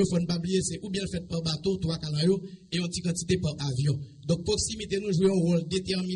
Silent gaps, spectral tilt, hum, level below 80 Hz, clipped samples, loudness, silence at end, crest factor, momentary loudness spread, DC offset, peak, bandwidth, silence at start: none; -5.5 dB/octave; none; -50 dBFS; under 0.1%; -28 LUFS; 0 s; 14 dB; 7 LU; under 0.1%; -14 dBFS; 11 kHz; 0 s